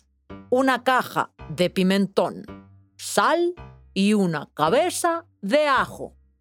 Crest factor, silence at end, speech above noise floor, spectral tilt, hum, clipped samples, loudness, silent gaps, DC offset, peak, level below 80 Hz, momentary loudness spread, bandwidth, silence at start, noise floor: 20 dB; 0.35 s; 23 dB; -5 dB/octave; none; under 0.1%; -22 LUFS; none; under 0.1%; -4 dBFS; -56 dBFS; 13 LU; 17.5 kHz; 0.3 s; -45 dBFS